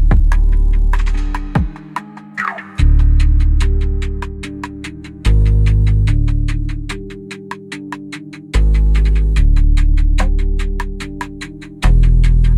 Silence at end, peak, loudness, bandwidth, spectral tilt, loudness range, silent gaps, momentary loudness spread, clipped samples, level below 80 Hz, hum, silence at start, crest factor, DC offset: 0 s; -2 dBFS; -17 LUFS; 9.6 kHz; -7 dB/octave; 2 LU; none; 15 LU; under 0.1%; -14 dBFS; none; 0 s; 10 dB; under 0.1%